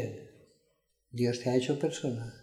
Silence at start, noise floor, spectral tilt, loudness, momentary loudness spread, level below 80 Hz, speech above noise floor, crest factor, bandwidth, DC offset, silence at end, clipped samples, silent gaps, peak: 0 s; -75 dBFS; -6 dB/octave; -32 LUFS; 14 LU; -70 dBFS; 44 dB; 20 dB; 13.5 kHz; under 0.1%; 0 s; under 0.1%; none; -14 dBFS